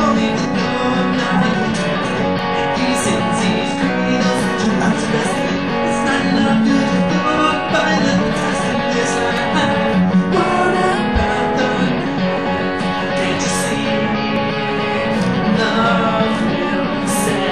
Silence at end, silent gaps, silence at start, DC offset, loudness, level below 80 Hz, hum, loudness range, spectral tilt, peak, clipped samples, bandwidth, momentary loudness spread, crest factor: 0 s; none; 0 s; 1%; -16 LUFS; -40 dBFS; none; 2 LU; -5 dB/octave; -2 dBFS; under 0.1%; 13 kHz; 4 LU; 14 dB